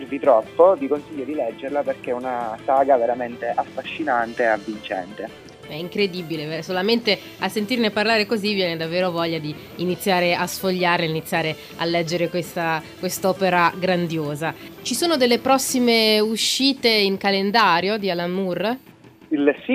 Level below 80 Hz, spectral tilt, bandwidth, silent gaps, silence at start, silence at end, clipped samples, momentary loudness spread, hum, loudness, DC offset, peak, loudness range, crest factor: -62 dBFS; -4 dB/octave; 15.5 kHz; none; 0 s; 0 s; under 0.1%; 11 LU; none; -21 LUFS; under 0.1%; -2 dBFS; 6 LU; 18 dB